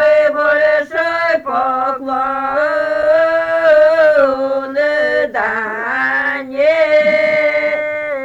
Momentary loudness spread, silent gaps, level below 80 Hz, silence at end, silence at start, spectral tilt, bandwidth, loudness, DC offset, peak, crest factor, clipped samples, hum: 7 LU; none; -52 dBFS; 0 s; 0 s; -4.5 dB/octave; 7.8 kHz; -14 LUFS; under 0.1%; -2 dBFS; 12 dB; under 0.1%; none